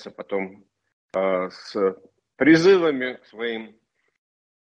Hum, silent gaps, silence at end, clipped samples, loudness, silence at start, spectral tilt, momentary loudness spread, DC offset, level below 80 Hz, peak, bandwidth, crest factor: none; 0.93-1.09 s; 1 s; under 0.1%; -22 LUFS; 0 s; -6 dB/octave; 15 LU; under 0.1%; -68 dBFS; -4 dBFS; 8.4 kHz; 20 dB